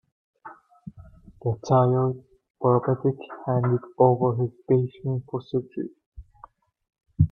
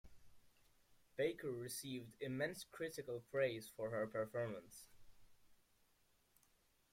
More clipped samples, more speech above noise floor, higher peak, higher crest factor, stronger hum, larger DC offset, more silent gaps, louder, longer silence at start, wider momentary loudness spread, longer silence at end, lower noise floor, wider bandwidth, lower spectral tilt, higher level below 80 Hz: neither; about the same, 29 dB vs 32 dB; first, -4 dBFS vs -28 dBFS; about the same, 20 dB vs 20 dB; neither; neither; first, 2.50-2.54 s, 6.06-6.12 s vs none; first, -24 LUFS vs -45 LUFS; first, 0.45 s vs 0.05 s; first, 18 LU vs 10 LU; second, 0.05 s vs 1.4 s; second, -52 dBFS vs -77 dBFS; second, 6.8 kHz vs 16.5 kHz; first, -10 dB/octave vs -4.5 dB/octave; first, -52 dBFS vs -76 dBFS